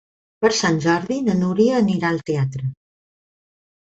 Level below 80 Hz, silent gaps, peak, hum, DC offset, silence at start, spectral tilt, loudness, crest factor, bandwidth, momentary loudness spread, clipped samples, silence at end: -56 dBFS; none; -4 dBFS; none; under 0.1%; 0.4 s; -5.5 dB/octave; -20 LUFS; 16 dB; 8.2 kHz; 7 LU; under 0.1%; 1.25 s